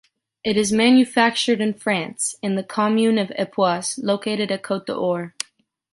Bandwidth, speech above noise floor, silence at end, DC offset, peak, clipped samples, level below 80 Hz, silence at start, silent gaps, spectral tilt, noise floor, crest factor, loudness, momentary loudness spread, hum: 11.5 kHz; 40 dB; 0.65 s; under 0.1%; -2 dBFS; under 0.1%; -62 dBFS; 0.45 s; none; -4 dB/octave; -60 dBFS; 18 dB; -20 LUFS; 11 LU; none